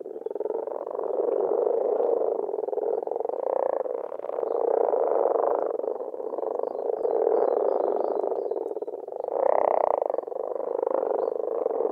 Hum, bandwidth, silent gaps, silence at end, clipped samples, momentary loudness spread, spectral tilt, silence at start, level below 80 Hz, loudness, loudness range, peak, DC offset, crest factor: none; 2.9 kHz; none; 0 s; under 0.1%; 9 LU; -8 dB/octave; 0 s; -80 dBFS; -27 LUFS; 1 LU; -6 dBFS; under 0.1%; 20 dB